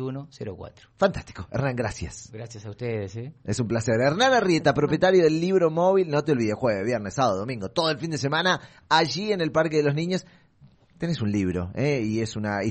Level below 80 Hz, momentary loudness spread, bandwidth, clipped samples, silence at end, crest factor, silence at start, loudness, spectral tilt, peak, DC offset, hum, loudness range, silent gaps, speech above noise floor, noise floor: -52 dBFS; 16 LU; 8.8 kHz; under 0.1%; 0 s; 20 dB; 0 s; -24 LUFS; -5.5 dB/octave; -6 dBFS; under 0.1%; none; 7 LU; none; 32 dB; -56 dBFS